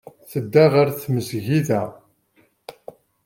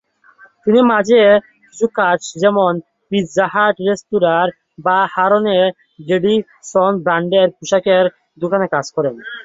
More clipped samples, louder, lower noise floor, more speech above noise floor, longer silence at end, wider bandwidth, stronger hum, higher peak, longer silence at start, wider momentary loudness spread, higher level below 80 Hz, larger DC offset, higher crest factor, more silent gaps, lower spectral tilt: neither; second, -20 LUFS vs -15 LUFS; first, -61 dBFS vs -48 dBFS; first, 43 dB vs 33 dB; first, 0.55 s vs 0 s; first, 17 kHz vs 7.8 kHz; neither; about the same, -2 dBFS vs -2 dBFS; second, 0.3 s vs 0.65 s; first, 17 LU vs 9 LU; about the same, -62 dBFS vs -58 dBFS; neither; about the same, 18 dB vs 14 dB; neither; first, -7 dB/octave vs -5 dB/octave